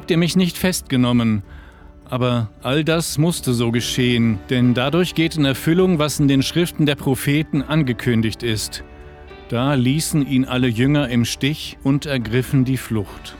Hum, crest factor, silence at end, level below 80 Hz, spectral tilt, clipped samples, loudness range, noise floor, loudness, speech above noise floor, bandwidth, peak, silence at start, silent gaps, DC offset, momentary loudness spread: none; 14 dB; 0 s; -42 dBFS; -5.5 dB/octave; under 0.1%; 3 LU; -42 dBFS; -19 LUFS; 23 dB; 20 kHz; -4 dBFS; 0 s; none; under 0.1%; 6 LU